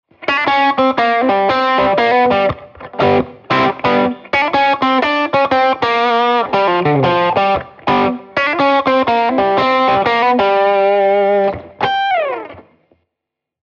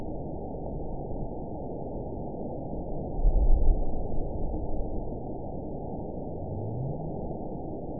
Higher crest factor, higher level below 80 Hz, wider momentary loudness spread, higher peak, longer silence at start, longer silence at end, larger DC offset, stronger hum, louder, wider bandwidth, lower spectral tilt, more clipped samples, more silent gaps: about the same, 14 dB vs 18 dB; second, -48 dBFS vs -30 dBFS; second, 5 LU vs 8 LU; first, 0 dBFS vs -10 dBFS; first, 0.2 s vs 0 s; first, 1.05 s vs 0 s; second, under 0.1% vs 0.9%; neither; first, -14 LUFS vs -35 LUFS; first, 7 kHz vs 1 kHz; second, -6.5 dB/octave vs -16.5 dB/octave; neither; neither